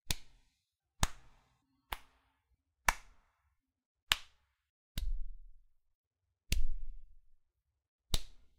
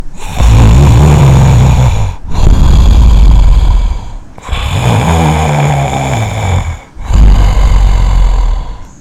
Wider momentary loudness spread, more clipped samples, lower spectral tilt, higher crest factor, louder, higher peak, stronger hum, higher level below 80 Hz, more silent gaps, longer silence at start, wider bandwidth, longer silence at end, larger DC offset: about the same, 15 LU vs 14 LU; second, under 0.1% vs 4%; second, -2 dB/octave vs -6.5 dB/octave; first, 34 dB vs 6 dB; second, -39 LUFS vs -9 LUFS; second, -4 dBFS vs 0 dBFS; neither; second, -42 dBFS vs -8 dBFS; first, 3.86-3.95 s, 4.02-4.07 s, 4.70-4.95 s, 5.95-6.11 s, 7.88-7.99 s vs none; about the same, 0.05 s vs 0 s; first, 16 kHz vs 12.5 kHz; about the same, 0.2 s vs 0.15 s; neither